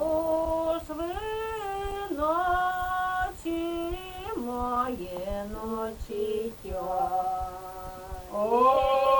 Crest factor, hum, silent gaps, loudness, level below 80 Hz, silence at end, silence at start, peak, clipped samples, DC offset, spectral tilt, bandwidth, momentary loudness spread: 18 dB; none; none; -29 LUFS; -44 dBFS; 0 s; 0 s; -12 dBFS; under 0.1%; under 0.1%; -5.5 dB/octave; over 20 kHz; 11 LU